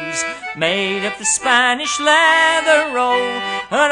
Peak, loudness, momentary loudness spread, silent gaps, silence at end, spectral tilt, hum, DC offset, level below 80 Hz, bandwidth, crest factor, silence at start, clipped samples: 0 dBFS; -15 LUFS; 10 LU; none; 0 s; -1 dB/octave; none; under 0.1%; -56 dBFS; 10.5 kHz; 16 dB; 0 s; under 0.1%